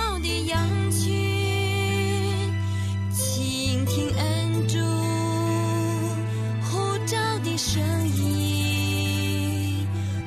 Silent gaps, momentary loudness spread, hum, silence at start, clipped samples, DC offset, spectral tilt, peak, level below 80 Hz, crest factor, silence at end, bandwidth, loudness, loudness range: none; 3 LU; none; 0 s; under 0.1%; under 0.1%; -5 dB/octave; -12 dBFS; -46 dBFS; 12 dB; 0 s; 14 kHz; -25 LUFS; 1 LU